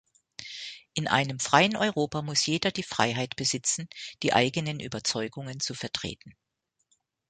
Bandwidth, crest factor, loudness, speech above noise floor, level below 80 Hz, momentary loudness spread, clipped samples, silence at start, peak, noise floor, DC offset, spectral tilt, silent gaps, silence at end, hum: 9.6 kHz; 26 dB; -27 LUFS; 45 dB; -62 dBFS; 15 LU; under 0.1%; 0.4 s; -4 dBFS; -73 dBFS; under 0.1%; -3 dB/octave; none; 1 s; none